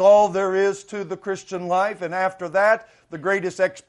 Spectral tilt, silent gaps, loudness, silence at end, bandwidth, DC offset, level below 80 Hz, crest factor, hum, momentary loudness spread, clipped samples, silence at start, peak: -5 dB/octave; none; -22 LUFS; 0.1 s; 11 kHz; under 0.1%; -66 dBFS; 16 dB; none; 11 LU; under 0.1%; 0 s; -6 dBFS